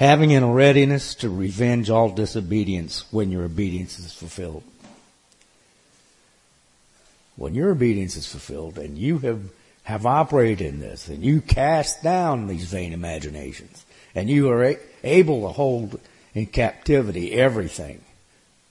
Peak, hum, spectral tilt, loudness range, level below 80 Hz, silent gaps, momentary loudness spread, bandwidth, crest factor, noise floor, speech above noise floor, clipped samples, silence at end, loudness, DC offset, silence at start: -2 dBFS; none; -6.5 dB/octave; 10 LU; -40 dBFS; none; 18 LU; 11.5 kHz; 20 dB; -59 dBFS; 38 dB; under 0.1%; 0.75 s; -21 LUFS; under 0.1%; 0 s